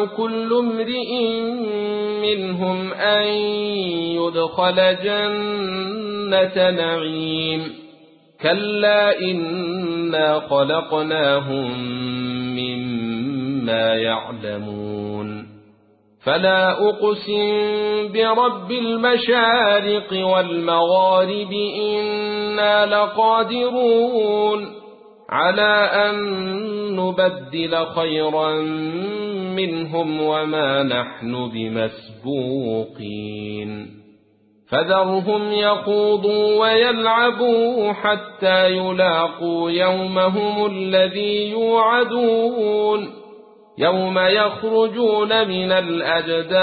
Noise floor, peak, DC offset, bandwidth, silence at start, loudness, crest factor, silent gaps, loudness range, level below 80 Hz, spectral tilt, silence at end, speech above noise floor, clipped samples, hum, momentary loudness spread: -57 dBFS; -2 dBFS; under 0.1%; 4.8 kHz; 0 s; -19 LUFS; 16 dB; none; 5 LU; -60 dBFS; -10 dB/octave; 0 s; 38 dB; under 0.1%; none; 9 LU